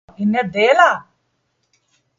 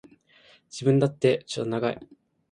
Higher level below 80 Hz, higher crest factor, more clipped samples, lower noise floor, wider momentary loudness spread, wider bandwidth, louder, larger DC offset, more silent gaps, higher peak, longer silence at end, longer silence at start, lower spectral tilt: about the same, -62 dBFS vs -66 dBFS; about the same, 18 dB vs 20 dB; neither; first, -68 dBFS vs -58 dBFS; second, 8 LU vs 13 LU; second, 7.6 kHz vs 10.5 kHz; first, -15 LUFS vs -25 LUFS; neither; neither; first, 0 dBFS vs -8 dBFS; first, 1.15 s vs 0.45 s; second, 0.2 s vs 0.75 s; second, -5 dB/octave vs -6.5 dB/octave